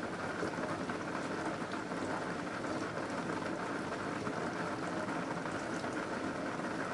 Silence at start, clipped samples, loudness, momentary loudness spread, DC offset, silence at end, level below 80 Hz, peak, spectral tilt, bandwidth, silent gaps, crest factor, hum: 0 s; under 0.1%; -38 LUFS; 1 LU; under 0.1%; 0 s; -68 dBFS; -22 dBFS; -5 dB/octave; 11.5 kHz; none; 16 dB; none